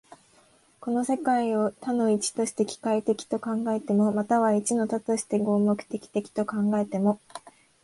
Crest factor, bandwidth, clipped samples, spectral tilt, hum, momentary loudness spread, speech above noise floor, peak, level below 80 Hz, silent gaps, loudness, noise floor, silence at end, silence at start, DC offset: 16 dB; 11.5 kHz; under 0.1%; -5.5 dB/octave; none; 7 LU; 35 dB; -10 dBFS; -70 dBFS; none; -26 LUFS; -60 dBFS; 0.35 s; 0.8 s; under 0.1%